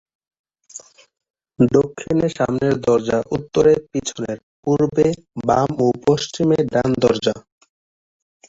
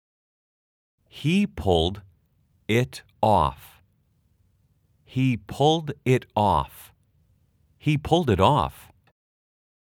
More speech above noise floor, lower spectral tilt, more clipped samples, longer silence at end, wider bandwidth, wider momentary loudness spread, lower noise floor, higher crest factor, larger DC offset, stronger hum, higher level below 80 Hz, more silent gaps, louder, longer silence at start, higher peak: second, 24 dB vs 43 dB; about the same, -6 dB/octave vs -6.5 dB/octave; neither; about the same, 1.1 s vs 1.2 s; second, 8 kHz vs 17.5 kHz; about the same, 12 LU vs 11 LU; second, -42 dBFS vs -66 dBFS; second, 18 dB vs 24 dB; neither; neither; about the same, -48 dBFS vs -48 dBFS; first, 1.30-1.34 s, 4.43-4.63 s vs none; first, -19 LUFS vs -23 LUFS; second, 0.75 s vs 1.15 s; about the same, -2 dBFS vs -2 dBFS